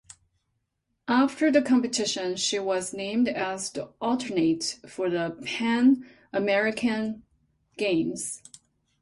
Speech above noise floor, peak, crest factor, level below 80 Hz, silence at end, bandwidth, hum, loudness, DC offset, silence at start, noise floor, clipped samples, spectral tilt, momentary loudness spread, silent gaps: 52 dB; -8 dBFS; 18 dB; -66 dBFS; 0.65 s; 11.5 kHz; none; -26 LUFS; under 0.1%; 1.05 s; -78 dBFS; under 0.1%; -3.5 dB/octave; 11 LU; none